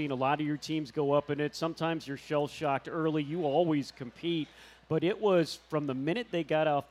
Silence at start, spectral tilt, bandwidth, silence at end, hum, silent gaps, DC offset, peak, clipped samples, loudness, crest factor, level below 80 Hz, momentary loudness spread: 0 s; -6.5 dB/octave; 14 kHz; 0.05 s; none; none; under 0.1%; -14 dBFS; under 0.1%; -31 LUFS; 16 dB; -68 dBFS; 6 LU